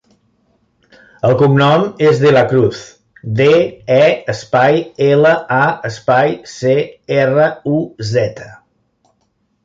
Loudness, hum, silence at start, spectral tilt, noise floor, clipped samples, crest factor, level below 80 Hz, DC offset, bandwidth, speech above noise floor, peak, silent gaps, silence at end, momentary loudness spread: -13 LUFS; none; 1.25 s; -6.5 dB/octave; -63 dBFS; under 0.1%; 14 dB; -52 dBFS; under 0.1%; 7.8 kHz; 50 dB; 0 dBFS; none; 1.1 s; 9 LU